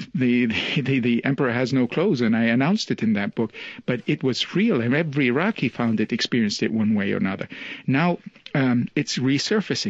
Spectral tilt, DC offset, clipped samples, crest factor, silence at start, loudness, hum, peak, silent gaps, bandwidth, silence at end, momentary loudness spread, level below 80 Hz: -5.5 dB/octave; under 0.1%; under 0.1%; 18 dB; 0 s; -22 LUFS; none; -4 dBFS; none; 8 kHz; 0 s; 7 LU; -60 dBFS